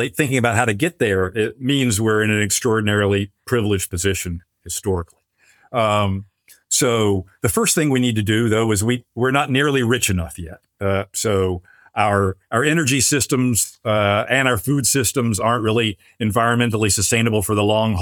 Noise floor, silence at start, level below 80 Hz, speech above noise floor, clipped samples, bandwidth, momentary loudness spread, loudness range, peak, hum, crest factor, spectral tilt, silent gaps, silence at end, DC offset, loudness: -56 dBFS; 0 s; -50 dBFS; 38 dB; under 0.1%; 19.5 kHz; 8 LU; 4 LU; 0 dBFS; none; 18 dB; -4 dB/octave; none; 0 s; under 0.1%; -18 LUFS